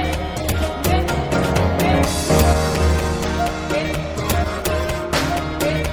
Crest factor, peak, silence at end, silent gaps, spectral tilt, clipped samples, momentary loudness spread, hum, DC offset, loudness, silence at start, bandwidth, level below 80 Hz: 18 dB; -2 dBFS; 0 s; none; -5 dB/octave; under 0.1%; 5 LU; none; under 0.1%; -19 LUFS; 0 s; 20 kHz; -28 dBFS